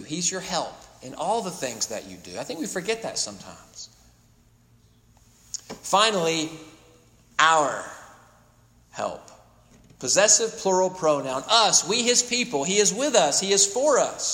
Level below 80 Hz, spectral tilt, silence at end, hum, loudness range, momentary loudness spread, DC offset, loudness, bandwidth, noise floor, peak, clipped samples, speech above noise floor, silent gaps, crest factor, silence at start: -62 dBFS; -1.5 dB/octave; 0 s; none; 12 LU; 22 LU; under 0.1%; -22 LUFS; 16.5 kHz; -58 dBFS; -2 dBFS; under 0.1%; 35 dB; none; 22 dB; 0 s